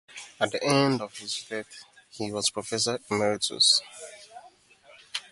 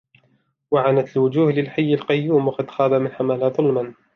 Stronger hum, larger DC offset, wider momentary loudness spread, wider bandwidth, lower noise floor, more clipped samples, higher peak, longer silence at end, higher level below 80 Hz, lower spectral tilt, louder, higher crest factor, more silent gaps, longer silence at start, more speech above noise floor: neither; neither; first, 23 LU vs 4 LU; first, 11.5 kHz vs 6.2 kHz; second, -56 dBFS vs -64 dBFS; neither; about the same, -8 dBFS vs -6 dBFS; second, 0.1 s vs 0.25 s; about the same, -68 dBFS vs -66 dBFS; second, -3 dB/octave vs -9 dB/octave; second, -26 LUFS vs -20 LUFS; first, 22 dB vs 14 dB; neither; second, 0.1 s vs 0.7 s; second, 29 dB vs 45 dB